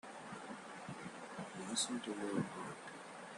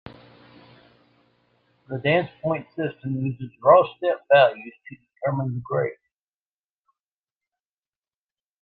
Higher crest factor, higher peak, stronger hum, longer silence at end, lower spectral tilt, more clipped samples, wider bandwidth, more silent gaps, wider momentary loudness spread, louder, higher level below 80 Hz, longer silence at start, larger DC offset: about the same, 20 dB vs 22 dB; second, -24 dBFS vs -4 dBFS; neither; second, 0 s vs 2.7 s; second, -3 dB/octave vs -9.5 dB/octave; neither; first, 12 kHz vs 4.8 kHz; neither; about the same, 12 LU vs 14 LU; second, -44 LUFS vs -22 LUFS; second, -82 dBFS vs -64 dBFS; about the same, 0.05 s vs 0.05 s; neither